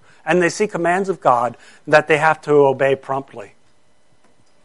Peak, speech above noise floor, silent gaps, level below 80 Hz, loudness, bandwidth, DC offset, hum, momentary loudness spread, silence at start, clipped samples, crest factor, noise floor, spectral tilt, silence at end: 0 dBFS; 43 dB; none; -64 dBFS; -17 LUFS; 11.5 kHz; 0.3%; none; 12 LU; 0.25 s; under 0.1%; 18 dB; -60 dBFS; -5.5 dB/octave; 1.2 s